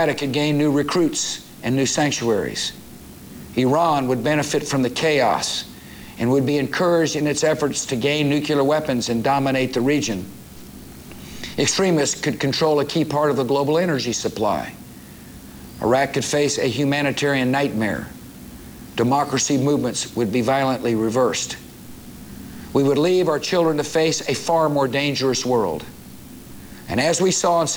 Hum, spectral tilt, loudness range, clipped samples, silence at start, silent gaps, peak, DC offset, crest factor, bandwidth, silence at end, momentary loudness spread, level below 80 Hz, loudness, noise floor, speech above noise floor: none; -4.5 dB/octave; 2 LU; under 0.1%; 0 s; none; -6 dBFS; under 0.1%; 16 dB; over 20 kHz; 0 s; 21 LU; -50 dBFS; -20 LUFS; -40 dBFS; 20 dB